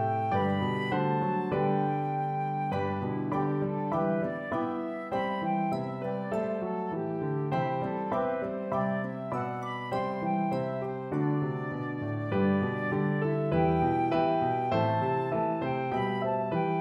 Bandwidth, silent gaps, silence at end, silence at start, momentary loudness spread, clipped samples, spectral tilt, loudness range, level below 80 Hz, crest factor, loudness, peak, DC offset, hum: 8.4 kHz; none; 0 s; 0 s; 6 LU; under 0.1%; -9 dB/octave; 4 LU; -58 dBFS; 14 dB; -30 LUFS; -16 dBFS; under 0.1%; none